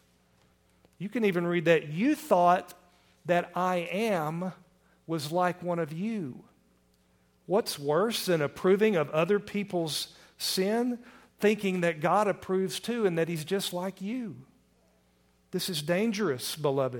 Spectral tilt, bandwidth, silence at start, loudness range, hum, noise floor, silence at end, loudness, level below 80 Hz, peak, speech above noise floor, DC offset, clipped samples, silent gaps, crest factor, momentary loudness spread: -5 dB/octave; 19 kHz; 1 s; 5 LU; none; -67 dBFS; 0 s; -29 LUFS; -70 dBFS; -10 dBFS; 38 dB; under 0.1%; under 0.1%; none; 20 dB; 11 LU